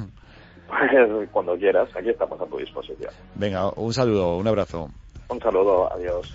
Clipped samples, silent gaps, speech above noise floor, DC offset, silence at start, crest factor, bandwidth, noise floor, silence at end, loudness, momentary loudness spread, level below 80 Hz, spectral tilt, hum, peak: under 0.1%; none; 25 dB; under 0.1%; 0 s; 18 dB; 7.8 kHz; -47 dBFS; 0 s; -22 LUFS; 16 LU; -48 dBFS; -6.5 dB/octave; none; -6 dBFS